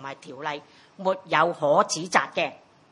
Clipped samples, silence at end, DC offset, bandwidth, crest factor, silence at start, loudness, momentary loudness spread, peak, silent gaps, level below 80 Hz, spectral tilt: under 0.1%; 0.35 s; under 0.1%; 11 kHz; 22 dB; 0 s; -25 LUFS; 12 LU; -4 dBFS; none; -78 dBFS; -3 dB/octave